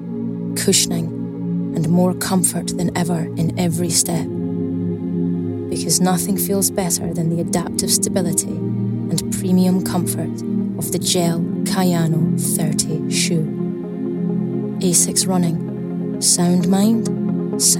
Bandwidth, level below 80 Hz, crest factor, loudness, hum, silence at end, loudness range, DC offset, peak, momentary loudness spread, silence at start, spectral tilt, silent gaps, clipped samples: 17 kHz; -52 dBFS; 18 dB; -18 LUFS; none; 0 s; 2 LU; under 0.1%; 0 dBFS; 8 LU; 0 s; -4.5 dB/octave; none; under 0.1%